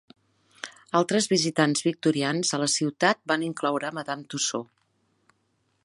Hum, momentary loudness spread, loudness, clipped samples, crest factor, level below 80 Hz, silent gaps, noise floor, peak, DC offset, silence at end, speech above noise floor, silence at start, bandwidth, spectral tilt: none; 11 LU; -25 LUFS; under 0.1%; 22 dB; -76 dBFS; none; -72 dBFS; -6 dBFS; under 0.1%; 1.2 s; 46 dB; 0.65 s; 11.5 kHz; -3.5 dB/octave